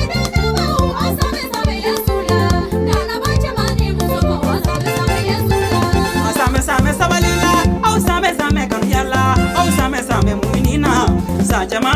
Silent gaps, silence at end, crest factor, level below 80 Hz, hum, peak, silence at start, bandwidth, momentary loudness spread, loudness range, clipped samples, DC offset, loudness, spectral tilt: none; 0 s; 12 dB; -22 dBFS; none; -2 dBFS; 0 s; 16 kHz; 4 LU; 2 LU; under 0.1%; under 0.1%; -16 LUFS; -5 dB/octave